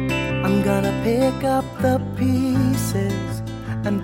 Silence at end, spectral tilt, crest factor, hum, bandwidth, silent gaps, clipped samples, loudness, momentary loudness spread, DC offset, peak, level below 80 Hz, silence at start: 0 s; -6.5 dB/octave; 14 dB; none; 16.5 kHz; none; under 0.1%; -21 LUFS; 7 LU; under 0.1%; -6 dBFS; -38 dBFS; 0 s